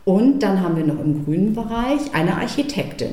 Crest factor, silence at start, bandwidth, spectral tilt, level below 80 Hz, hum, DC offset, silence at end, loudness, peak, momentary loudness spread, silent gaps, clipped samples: 12 dB; 0.05 s; 14.5 kHz; -7 dB/octave; -42 dBFS; none; 0.8%; 0 s; -20 LUFS; -6 dBFS; 6 LU; none; under 0.1%